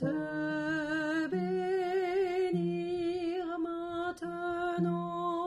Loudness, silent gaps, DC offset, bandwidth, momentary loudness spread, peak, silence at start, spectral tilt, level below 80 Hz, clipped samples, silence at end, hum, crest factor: -33 LUFS; none; under 0.1%; 11 kHz; 5 LU; -22 dBFS; 0 s; -7 dB/octave; -66 dBFS; under 0.1%; 0 s; none; 12 dB